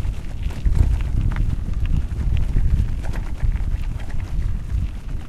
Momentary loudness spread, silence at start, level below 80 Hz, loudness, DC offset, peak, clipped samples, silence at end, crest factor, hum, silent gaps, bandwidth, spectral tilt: 8 LU; 0 s; -22 dBFS; -25 LUFS; under 0.1%; -4 dBFS; under 0.1%; 0 s; 16 dB; none; none; 9.8 kHz; -7.5 dB/octave